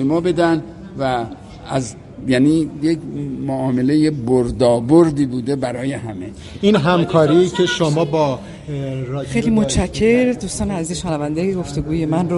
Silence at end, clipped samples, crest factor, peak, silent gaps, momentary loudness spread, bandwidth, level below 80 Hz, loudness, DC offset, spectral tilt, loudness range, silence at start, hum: 0 s; under 0.1%; 16 dB; 0 dBFS; none; 12 LU; 11.5 kHz; -38 dBFS; -18 LUFS; under 0.1%; -6 dB/octave; 3 LU; 0 s; none